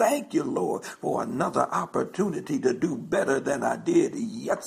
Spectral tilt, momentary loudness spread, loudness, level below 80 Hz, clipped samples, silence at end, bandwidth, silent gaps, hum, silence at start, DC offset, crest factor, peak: -5.5 dB/octave; 6 LU; -27 LUFS; -66 dBFS; under 0.1%; 0 s; 15.5 kHz; none; none; 0 s; under 0.1%; 18 dB; -8 dBFS